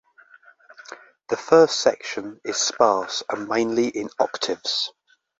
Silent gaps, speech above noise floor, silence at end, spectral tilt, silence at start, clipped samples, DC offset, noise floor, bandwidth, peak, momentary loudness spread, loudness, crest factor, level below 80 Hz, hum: none; 31 dB; 0.5 s; -2.5 dB/octave; 0.9 s; under 0.1%; under 0.1%; -52 dBFS; 8 kHz; -2 dBFS; 15 LU; -22 LUFS; 22 dB; -66 dBFS; none